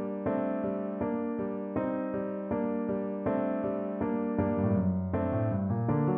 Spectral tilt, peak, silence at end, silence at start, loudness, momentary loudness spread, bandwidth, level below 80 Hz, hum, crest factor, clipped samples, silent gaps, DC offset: -10 dB/octave; -16 dBFS; 0 s; 0 s; -31 LUFS; 5 LU; 3.6 kHz; -58 dBFS; none; 14 dB; under 0.1%; none; under 0.1%